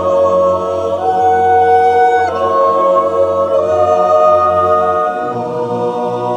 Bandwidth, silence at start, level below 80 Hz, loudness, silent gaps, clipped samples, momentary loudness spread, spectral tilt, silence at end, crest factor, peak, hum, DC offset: 9.4 kHz; 0 s; -50 dBFS; -12 LUFS; none; under 0.1%; 7 LU; -6 dB/octave; 0 s; 12 dB; 0 dBFS; none; under 0.1%